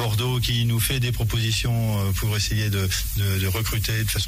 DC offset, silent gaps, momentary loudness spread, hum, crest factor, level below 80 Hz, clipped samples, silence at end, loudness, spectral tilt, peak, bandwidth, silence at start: under 0.1%; none; 2 LU; none; 12 dB; -34 dBFS; under 0.1%; 0 s; -23 LUFS; -4 dB/octave; -10 dBFS; 16 kHz; 0 s